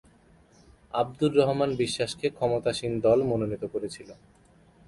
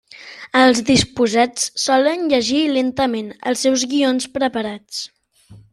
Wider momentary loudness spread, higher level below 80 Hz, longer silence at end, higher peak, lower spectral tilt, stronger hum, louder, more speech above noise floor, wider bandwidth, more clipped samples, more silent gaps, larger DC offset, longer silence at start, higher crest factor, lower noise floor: second, 11 LU vs 14 LU; second, -58 dBFS vs -50 dBFS; first, 0.75 s vs 0.15 s; second, -10 dBFS vs -2 dBFS; first, -5.5 dB/octave vs -3 dB/octave; neither; second, -27 LUFS vs -17 LUFS; about the same, 32 dB vs 29 dB; second, 11.5 kHz vs 13 kHz; neither; neither; neither; first, 0.95 s vs 0.15 s; about the same, 18 dB vs 16 dB; first, -58 dBFS vs -46 dBFS